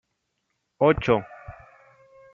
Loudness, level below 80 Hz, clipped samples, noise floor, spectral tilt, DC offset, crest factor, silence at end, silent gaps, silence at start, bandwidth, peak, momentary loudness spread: -22 LUFS; -48 dBFS; under 0.1%; -77 dBFS; -7.5 dB/octave; under 0.1%; 22 dB; 0.8 s; none; 0.8 s; 7 kHz; -6 dBFS; 24 LU